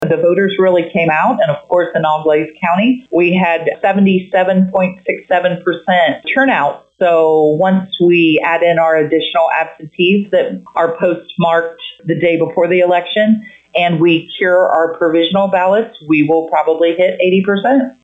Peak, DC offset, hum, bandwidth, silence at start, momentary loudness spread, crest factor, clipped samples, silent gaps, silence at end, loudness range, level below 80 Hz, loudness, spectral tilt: -2 dBFS; under 0.1%; none; 7.8 kHz; 0 s; 5 LU; 10 dB; under 0.1%; none; 0.1 s; 2 LU; -60 dBFS; -13 LUFS; -8 dB/octave